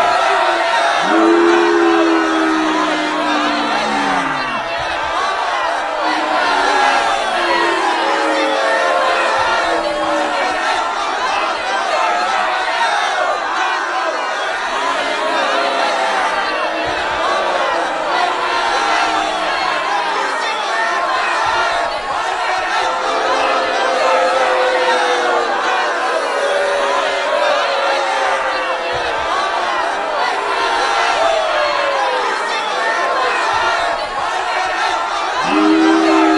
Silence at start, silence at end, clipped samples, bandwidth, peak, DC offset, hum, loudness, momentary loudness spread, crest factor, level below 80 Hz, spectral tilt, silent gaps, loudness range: 0 s; 0 s; under 0.1%; 11.5 kHz; 0 dBFS; under 0.1%; none; -15 LUFS; 5 LU; 14 dB; -48 dBFS; -2 dB/octave; none; 2 LU